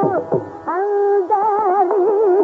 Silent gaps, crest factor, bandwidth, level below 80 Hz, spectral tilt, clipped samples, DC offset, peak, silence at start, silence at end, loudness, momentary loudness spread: none; 12 dB; 3 kHz; -66 dBFS; -8 dB/octave; under 0.1%; under 0.1%; -4 dBFS; 0 s; 0 s; -17 LUFS; 7 LU